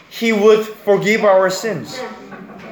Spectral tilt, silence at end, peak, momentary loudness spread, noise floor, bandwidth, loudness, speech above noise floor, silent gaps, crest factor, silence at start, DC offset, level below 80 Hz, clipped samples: -4.5 dB/octave; 0 s; 0 dBFS; 21 LU; -35 dBFS; over 20 kHz; -15 LUFS; 20 dB; none; 16 dB; 0.1 s; under 0.1%; -64 dBFS; under 0.1%